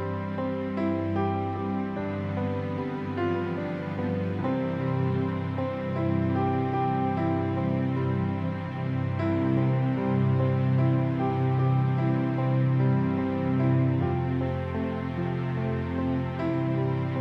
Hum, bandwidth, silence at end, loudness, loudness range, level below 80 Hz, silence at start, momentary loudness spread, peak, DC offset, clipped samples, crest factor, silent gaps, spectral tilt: none; 5.2 kHz; 0 s; -27 LUFS; 4 LU; -54 dBFS; 0 s; 6 LU; -14 dBFS; under 0.1%; under 0.1%; 12 dB; none; -10 dB/octave